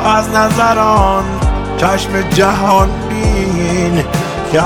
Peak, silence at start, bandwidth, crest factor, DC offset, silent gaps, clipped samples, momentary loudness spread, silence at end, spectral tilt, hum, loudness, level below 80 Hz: 0 dBFS; 0 s; 19 kHz; 12 dB; under 0.1%; none; under 0.1%; 6 LU; 0 s; -5.5 dB/octave; none; -12 LUFS; -22 dBFS